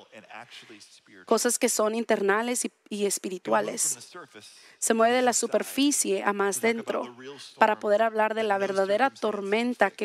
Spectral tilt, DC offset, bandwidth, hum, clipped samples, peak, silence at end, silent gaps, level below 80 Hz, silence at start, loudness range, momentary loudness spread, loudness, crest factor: -2.5 dB/octave; under 0.1%; 16 kHz; none; under 0.1%; -6 dBFS; 0 s; none; -80 dBFS; 0.15 s; 2 LU; 19 LU; -25 LUFS; 22 dB